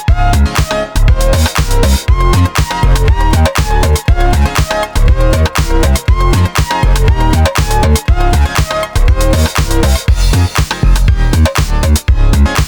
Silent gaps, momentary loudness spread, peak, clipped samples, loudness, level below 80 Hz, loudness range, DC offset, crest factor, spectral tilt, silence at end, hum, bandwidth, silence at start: none; 2 LU; 0 dBFS; under 0.1%; -11 LUFS; -12 dBFS; 0 LU; 2%; 8 dB; -5 dB/octave; 0 s; none; over 20 kHz; 0 s